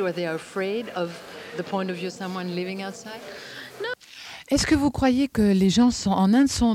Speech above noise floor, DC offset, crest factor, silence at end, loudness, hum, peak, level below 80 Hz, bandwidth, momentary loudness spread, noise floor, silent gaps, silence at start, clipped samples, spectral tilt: 19 dB; under 0.1%; 14 dB; 0 s; -24 LUFS; none; -10 dBFS; -44 dBFS; 15.5 kHz; 18 LU; -43 dBFS; none; 0 s; under 0.1%; -5 dB/octave